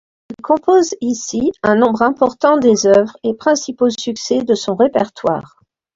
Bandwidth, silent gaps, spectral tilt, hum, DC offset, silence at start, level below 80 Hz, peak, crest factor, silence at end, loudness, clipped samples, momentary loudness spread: 7.8 kHz; none; -4.5 dB/octave; none; under 0.1%; 0.3 s; -54 dBFS; 0 dBFS; 14 dB; 0.55 s; -15 LUFS; under 0.1%; 8 LU